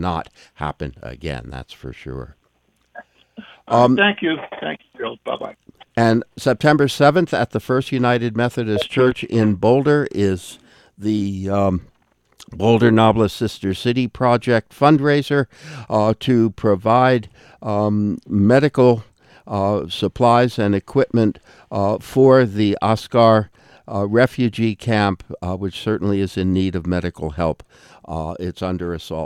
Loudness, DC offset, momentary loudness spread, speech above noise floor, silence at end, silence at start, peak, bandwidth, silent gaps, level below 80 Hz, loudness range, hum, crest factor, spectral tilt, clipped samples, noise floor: -18 LUFS; under 0.1%; 14 LU; 46 dB; 0 s; 0 s; 0 dBFS; 14 kHz; none; -48 dBFS; 5 LU; none; 18 dB; -7 dB/octave; under 0.1%; -63 dBFS